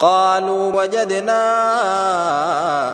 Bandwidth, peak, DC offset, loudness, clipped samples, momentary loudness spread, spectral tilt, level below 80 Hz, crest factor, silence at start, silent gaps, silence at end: 10.5 kHz; -2 dBFS; under 0.1%; -17 LUFS; under 0.1%; 3 LU; -3.5 dB/octave; -64 dBFS; 16 dB; 0 s; none; 0 s